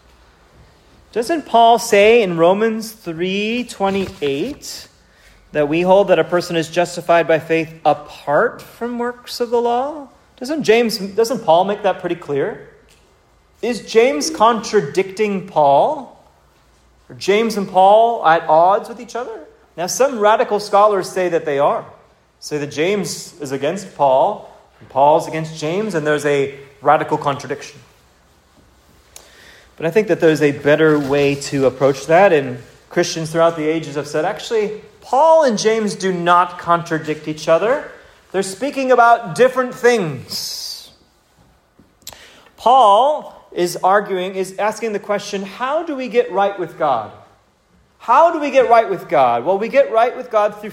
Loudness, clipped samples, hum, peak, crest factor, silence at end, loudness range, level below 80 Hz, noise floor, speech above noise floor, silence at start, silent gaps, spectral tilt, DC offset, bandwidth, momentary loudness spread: -16 LUFS; under 0.1%; none; 0 dBFS; 16 dB; 0 s; 5 LU; -56 dBFS; -55 dBFS; 40 dB; 1.15 s; none; -4.5 dB/octave; under 0.1%; 16 kHz; 13 LU